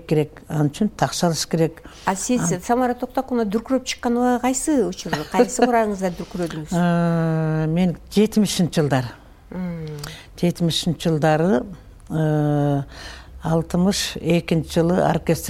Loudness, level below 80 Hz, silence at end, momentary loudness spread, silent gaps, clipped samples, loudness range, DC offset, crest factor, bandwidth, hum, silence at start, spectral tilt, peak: -21 LUFS; -44 dBFS; 0 s; 10 LU; none; under 0.1%; 2 LU; under 0.1%; 18 dB; 17 kHz; none; 0 s; -5.5 dB/octave; -2 dBFS